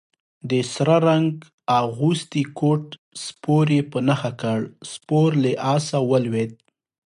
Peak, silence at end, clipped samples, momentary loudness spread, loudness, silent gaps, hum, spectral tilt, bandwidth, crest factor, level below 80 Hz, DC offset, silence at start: -4 dBFS; 0.6 s; under 0.1%; 13 LU; -21 LUFS; 1.53-1.58 s, 2.98-3.11 s; none; -6.5 dB/octave; 11.5 kHz; 16 dB; -64 dBFS; under 0.1%; 0.45 s